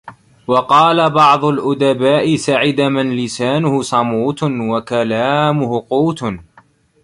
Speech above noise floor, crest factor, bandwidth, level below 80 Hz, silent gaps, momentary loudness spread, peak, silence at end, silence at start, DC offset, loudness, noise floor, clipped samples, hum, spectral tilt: 36 dB; 14 dB; 11.5 kHz; -52 dBFS; none; 8 LU; 0 dBFS; 0.6 s; 0.05 s; under 0.1%; -14 LUFS; -50 dBFS; under 0.1%; none; -5.5 dB/octave